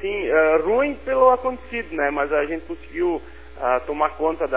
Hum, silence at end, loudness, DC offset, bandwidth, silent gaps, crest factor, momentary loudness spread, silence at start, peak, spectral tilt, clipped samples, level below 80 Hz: none; 0 s; -21 LUFS; 0.8%; 4 kHz; none; 18 dB; 11 LU; 0 s; -4 dBFS; -9 dB/octave; under 0.1%; -44 dBFS